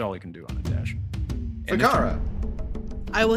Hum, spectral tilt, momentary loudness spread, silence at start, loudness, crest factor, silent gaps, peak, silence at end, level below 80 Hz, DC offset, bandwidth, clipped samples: none; -6 dB/octave; 14 LU; 0 s; -27 LUFS; 20 dB; none; -6 dBFS; 0 s; -32 dBFS; under 0.1%; 16 kHz; under 0.1%